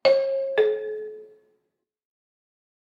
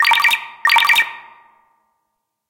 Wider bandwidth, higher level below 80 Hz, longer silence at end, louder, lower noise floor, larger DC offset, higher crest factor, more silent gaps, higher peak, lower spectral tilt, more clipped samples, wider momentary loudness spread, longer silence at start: second, 7.2 kHz vs 17.5 kHz; second, -80 dBFS vs -64 dBFS; first, 1.65 s vs 1.3 s; second, -24 LUFS vs -13 LUFS; first, -78 dBFS vs -74 dBFS; neither; about the same, 20 dB vs 16 dB; neither; second, -8 dBFS vs -4 dBFS; first, -4 dB/octave vs 2.5 dB/octave; neither; first, 17 LU vs 6 LU; about the same, 0.05 s vs 0 s